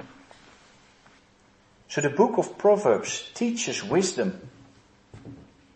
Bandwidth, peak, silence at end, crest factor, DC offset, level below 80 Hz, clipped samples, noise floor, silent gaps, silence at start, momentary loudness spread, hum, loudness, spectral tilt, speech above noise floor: 8.8 kHz; -6 dBFS; 0.35 s; 22 dB; under 0.1%; -66 dBFS; under 0.1%; -59 dBFS; none; 0 s; 24 LU; none; -25 LUFS; -4.5 dB/octave; 35 dB